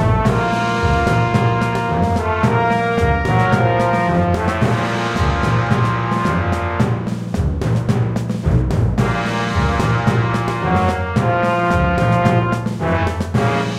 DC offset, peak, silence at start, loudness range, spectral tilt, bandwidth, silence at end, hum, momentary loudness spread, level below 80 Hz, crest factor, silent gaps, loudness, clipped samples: under 0.1%; 0 dBFS; 0 s; 2 LU; -7 dB/octave; 12 kHz; 0 s; none; 4 LU; -28 dBFS; 16 dB; none; -17 LUFS; under 0.1%